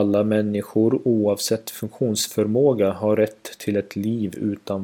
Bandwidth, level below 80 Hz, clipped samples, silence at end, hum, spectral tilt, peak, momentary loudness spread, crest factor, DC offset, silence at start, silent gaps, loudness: 18 kHz; -64 dBFS; under 0.1%; 0 s; none; -5.5 dB/octave; -6 dBFS; 7 LU; 14 dB; under 0.1%; 0 s; none; -22 LUFS